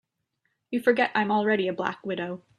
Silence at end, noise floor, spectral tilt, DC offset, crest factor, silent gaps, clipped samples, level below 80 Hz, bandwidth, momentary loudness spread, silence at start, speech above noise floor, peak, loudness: 0.2 s; -77 dBFS; -6.5 dB/octave; under 0.1%; 20 dB; none; under 0.1%; -72 dBFS; 13 kHz; 9 LU; 0.7 s; 51 dB; -8 dBFS; -26 LUFS